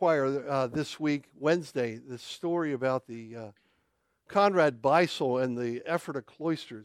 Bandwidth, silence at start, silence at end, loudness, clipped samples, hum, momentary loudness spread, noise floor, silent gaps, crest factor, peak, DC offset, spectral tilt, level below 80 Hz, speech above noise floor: 14.5 kHz; 0 s; 0 s; -29 LUFS; under 0.1%; none; 16 LU; -75 dBFS; none; 20 dB; -10 dBFS; under 0.1%; -6 dB/octave; -72 dBFS; 46 dB